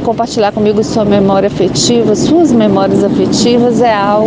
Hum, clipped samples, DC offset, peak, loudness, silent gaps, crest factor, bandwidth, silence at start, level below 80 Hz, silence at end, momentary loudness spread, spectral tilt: none; under 0.1%; under 0.1%; 0 dBFS; -10 LUFS; none; 8 dB; 10 kHz; 0 s; -38 dBFS; 0 s; 3 LU; -5.5 dB/octave